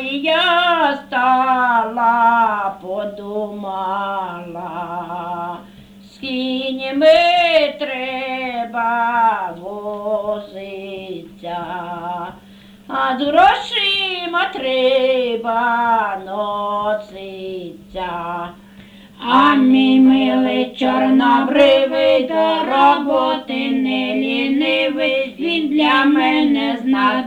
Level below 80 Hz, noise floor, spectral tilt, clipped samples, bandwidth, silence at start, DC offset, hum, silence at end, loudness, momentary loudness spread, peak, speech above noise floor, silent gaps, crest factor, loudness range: -54 dBFS; -43 dBFS; -5 dB/octave; under 0.1%; 9.6 kHz; 0 s; under 0.1%; none; 0 s; -16 LUFS; 16 LU; -2 dBFS; 27 dB; none; 16 dB; 11 LU